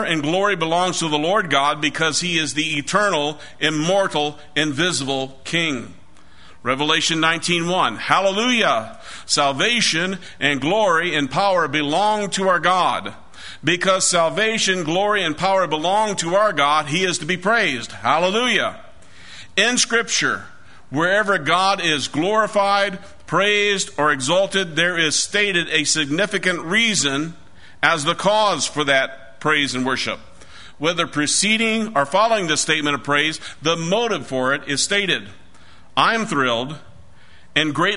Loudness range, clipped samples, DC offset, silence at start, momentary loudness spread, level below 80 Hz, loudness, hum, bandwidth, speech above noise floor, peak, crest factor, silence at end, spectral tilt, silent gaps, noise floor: 2 LU; under 0.1%; 1%; 0 s; 7 LU; -56 dBFS; -18 LUFS; none; 11 kHz; 30 dB; 0 dBFS; 20 dB; 0 s; -2.5 dB/octave; none; -50 dBFS